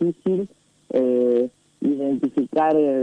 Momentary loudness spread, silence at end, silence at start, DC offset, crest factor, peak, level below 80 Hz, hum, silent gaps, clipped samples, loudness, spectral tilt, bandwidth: 8 LU; 0 s; 0 s; under 0.1%; 14 dB; -8 dBFS; -66 dBFS; none; none; under 0.1%; -22 LUFS; -9 dB/octave; 9.6 kHz